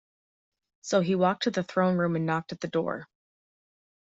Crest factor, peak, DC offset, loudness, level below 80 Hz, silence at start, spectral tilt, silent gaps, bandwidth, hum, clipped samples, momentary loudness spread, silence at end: 18 dB; -10 dBFS; under 0.1%; -27 LUFS; -70 dBFS; 0.85 s; -6 dB/octave; none; 7.8 kHz; none; under 0.1%; 8 LU; 1 s